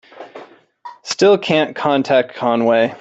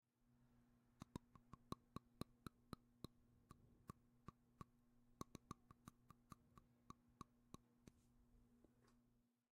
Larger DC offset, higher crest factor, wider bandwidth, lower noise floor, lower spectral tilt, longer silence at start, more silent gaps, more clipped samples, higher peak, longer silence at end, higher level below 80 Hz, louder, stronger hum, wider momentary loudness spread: neither; second, 16 dB vs 34 dB; second, 8.2 kHz vs 13.5 kHz; second, -40 dBFS vs -82 dBFS; about the same, -4.5 dB/octave vs -5.5 dB/octave; about the same, 0.15 s vs 0.2 s; neither; neither; first, -2 dBFS vs -32 dBFS; second, 0.05 s vs 0.35 s; first, -62 dBFS vs -76 dBFS; first, -16 LUFS vs -63 LUFS; neither; first, 22 LU vs 9 LU